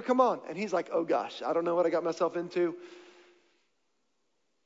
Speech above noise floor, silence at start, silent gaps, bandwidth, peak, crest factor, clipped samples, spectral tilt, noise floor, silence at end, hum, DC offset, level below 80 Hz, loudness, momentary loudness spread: 50 dB; 0 s; none; 7.8 kHz; -12 dBFS; 20 dB; under 0.1%; -5.5 dB/octave; -79 dBFS; 1.65 s; none; under 0.1%; -86 dBFS; -30 LUFS; 7 LU